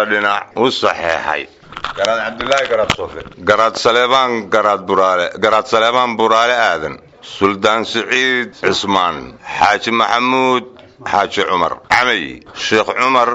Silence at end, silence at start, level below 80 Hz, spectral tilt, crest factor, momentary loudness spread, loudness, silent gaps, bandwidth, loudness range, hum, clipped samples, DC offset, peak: 0 s; 0 s; -48 dBFS; -3.5 dB/octave; 16 dB; 9 LU; -14 LUFS; none; 8.2 kHz; 3 LU; none; under 0.1%; under 0.1%; 0 dBFS